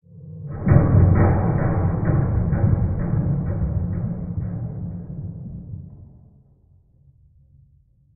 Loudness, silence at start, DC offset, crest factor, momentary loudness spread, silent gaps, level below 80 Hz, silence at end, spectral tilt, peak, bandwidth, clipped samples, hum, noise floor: -21 LUFS; 0.15 s; under 0.1%; 20 dB; 20 LU; none; -32 dBFS; 2.1 s; -14.5 dB/octave; -2 dBFS; 2.6 kHz; under 0.1%; none; -57 dBFS